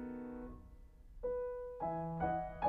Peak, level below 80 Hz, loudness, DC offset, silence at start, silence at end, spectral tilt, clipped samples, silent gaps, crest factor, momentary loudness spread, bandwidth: -22 dBFS; -56 dBFS; -42 LUFS; under 0.1%; 0 s; 0 s; -9.5 dB/octave; under 0.1%; none; 18 dB; 22 LU; 4.5 kHz